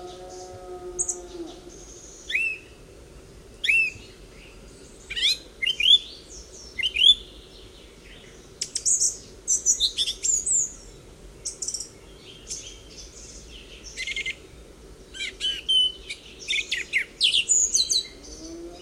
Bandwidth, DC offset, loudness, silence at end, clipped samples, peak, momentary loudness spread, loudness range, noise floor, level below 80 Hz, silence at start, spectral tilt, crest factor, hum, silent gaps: 16 kHz; under 0.1%; -22 LUFS; 0 s; under 0.1%; -6 dBFS; 24 LU; 13 LU; -47 dBFS; -50 dBFS; 0 s; 1.5 dB/octave; 22 dB; none; none